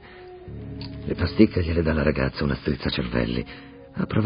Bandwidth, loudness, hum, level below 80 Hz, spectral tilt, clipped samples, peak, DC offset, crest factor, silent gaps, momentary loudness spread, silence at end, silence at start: 5.4 kHz; -24 LUFS; none; -36 dBFS; -11.5 dB/octave; under 0.1%; -2 dBFS; under 0.1%; 22 dB; none; 19 LU; 0 s; 0 s